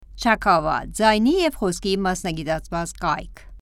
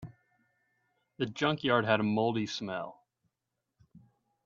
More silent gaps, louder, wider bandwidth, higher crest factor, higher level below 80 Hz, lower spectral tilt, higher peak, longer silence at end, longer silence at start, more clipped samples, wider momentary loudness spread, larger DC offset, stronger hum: neither; first, -21 LUFS vs -31 LUFS; first, 16 kHz vs 7.6 kHz; second, 18 dB vs 24 dB; first, -40 dBFS vs -70 dBFS; about the same, -4.5 dB/octave vs -5.5 dB/octave; first, -4 dBFS vs -10 dBFS; second, 0 s vs 0.45 s; about the same, 0 s vs 0 s; neither; second, 9 LU vs 13 LU; neither; neither